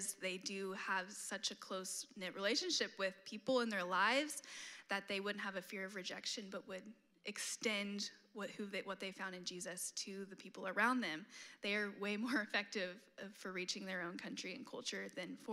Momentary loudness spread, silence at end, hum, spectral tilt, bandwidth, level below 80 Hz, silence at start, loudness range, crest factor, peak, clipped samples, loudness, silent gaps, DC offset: 13 LU; 0 s; none; -2.5 dB/octave; 15.5 kHz; under -90 dBFS; 0 s; 5 LU; 20 dB; -22 dBFS; under 0.1%; -42 LUFS; none; under 0.1%